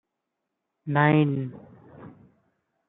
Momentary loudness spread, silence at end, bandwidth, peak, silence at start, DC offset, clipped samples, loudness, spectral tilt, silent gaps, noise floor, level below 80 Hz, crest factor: 18 LU; 0.8 s; 4 kHz; -6 dBFS; 0.85 s; under 0.1%; under 0.1%; -23 LUFS; -11.5 dB/octave; none; -82 dBFS; -70 dBFS; 22 dB